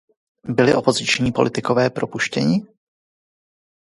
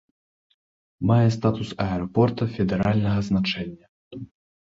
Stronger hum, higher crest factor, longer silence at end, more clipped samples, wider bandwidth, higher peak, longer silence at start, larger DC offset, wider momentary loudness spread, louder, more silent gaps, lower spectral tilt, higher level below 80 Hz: neither; about the same, 20 dB vs 18 dB; first, 1.25 s vs 0.4 s; neither; first, 11.5 kHz vs 7.6 kHz; first, 0 dBFS vs -6 dBFS; second, 0.45 s vs 1 s; neither; second, 7 LU vs 21 LU; first, -19 LUFS vs -23 LUFS; second, none vs 3.89-4.11 s; second, -5 dB/octave vs -7.5 dB/octave; second, -52 dBFS vs -46 dBFS